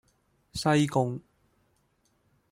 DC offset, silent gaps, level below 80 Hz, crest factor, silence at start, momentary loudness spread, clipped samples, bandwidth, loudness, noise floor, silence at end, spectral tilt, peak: under 0.1%; none; -60 dBFS; 20 dB; 0.55 s; 16 LU; under 0.1%; 15.5 kHz; -27 LUFS; -71 dBFS; 1.3 s; -6 dB/octave; -10 dBFS